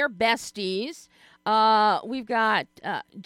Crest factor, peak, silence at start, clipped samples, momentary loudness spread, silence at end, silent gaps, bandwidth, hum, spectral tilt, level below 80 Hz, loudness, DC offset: 16 dB; -8 dBFS; 0 s; under 0.1%; 13 LU; 0.05 s; none; 15 kHz; none; -3.5 dB/octave; -70 dBFS; -24 LUFS; under 0.1%